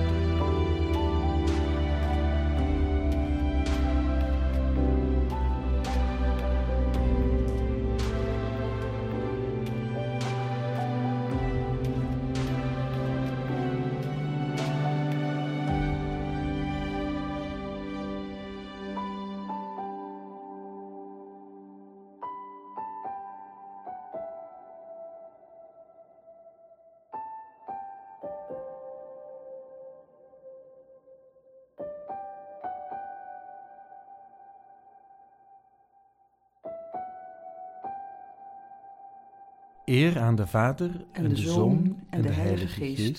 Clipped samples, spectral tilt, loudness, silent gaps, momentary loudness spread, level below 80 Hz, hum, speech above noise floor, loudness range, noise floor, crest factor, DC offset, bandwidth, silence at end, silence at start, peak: under 0.1%; -7.5 dB/octave; -29 LUFS; none; 20 LU; -34 dBFS; none; 41 dB; 18 LU; -67 dBFS; 20 dB; under 0.1%; 13 kHz; 0 s; 0 s; -10 dBFS